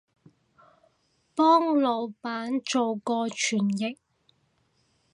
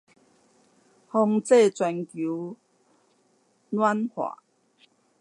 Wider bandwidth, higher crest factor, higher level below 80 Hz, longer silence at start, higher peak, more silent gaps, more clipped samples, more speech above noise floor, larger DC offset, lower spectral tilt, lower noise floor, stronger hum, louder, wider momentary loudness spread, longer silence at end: about the same, 11 kHz vs 11.5 kHz; about the same, 20 dB vs 20 dB; about the same, -80 dBFS vs -84 dBFS; first, 1.35 s vs 1.15 s; about the same, -8 dBFS vs -8 dBFS; neither; neither; about the same, 44 dB vs 43 dB; neither; second, -4 dB/octave vs -5.5 dB/octave; first, -70 dBFS vs -66 dBFS; neither; about the same, -26 LUFS vs -25 LUFS; about the same, 12 LU vs 14 LU; first, 1.2 s vs 0.9 s